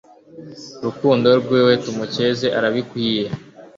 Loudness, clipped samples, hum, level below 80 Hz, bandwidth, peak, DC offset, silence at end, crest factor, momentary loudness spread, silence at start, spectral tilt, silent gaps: -18 LUFS; under 0.1%; none; -58 dBFS; 7.6 kHz; -2 dBFS; under 0.1%; 0.1 s; 18 dB; 17 LU; 0.35 s; -6 dB/octave; none